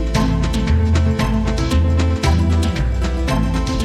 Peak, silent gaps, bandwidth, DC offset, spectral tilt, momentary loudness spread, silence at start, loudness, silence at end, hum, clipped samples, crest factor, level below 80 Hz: -4 dBFS; none; 13 kHz; under 0.1%; -6.5 dB/octave; 3 LU; 0 s; -18 LUFS; 0 s; none; under 0.1%; 12 dB; -20 dBFS